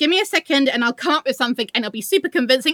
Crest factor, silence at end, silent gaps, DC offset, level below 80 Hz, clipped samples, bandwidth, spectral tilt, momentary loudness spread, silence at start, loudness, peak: 16 dB; 0 s; none; under 0.1%; -76 dBFS; under 0.1%; 19.5 kHz; -2.5 dB/octave; 5 LU; 0 s; -19 LUFS; -2 dBFS